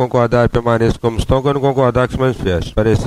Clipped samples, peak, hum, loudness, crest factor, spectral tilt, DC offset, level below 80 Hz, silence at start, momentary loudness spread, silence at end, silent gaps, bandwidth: under 0.1%; -2 dBFS; none; -15 LUFS; 12 dB; -7.5 dB/octave; under 0.1%; -28 dBFS; 0 s; 4 LU; 0 s; none; 12.5 kHz